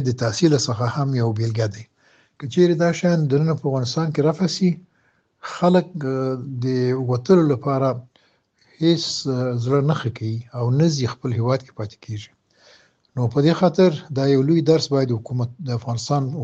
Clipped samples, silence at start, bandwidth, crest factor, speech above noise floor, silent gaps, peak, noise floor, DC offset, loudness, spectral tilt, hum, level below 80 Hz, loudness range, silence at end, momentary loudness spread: under 0.1%; 0 s; 8.2 kHz; 18 dB; 44 dB; none; -4 dBFS; -64 dBFS; under 0.1%; -20 LUFS; -6.5 dB/octave; none; -60 dBFS; 3 LU; 0 s; 11 LU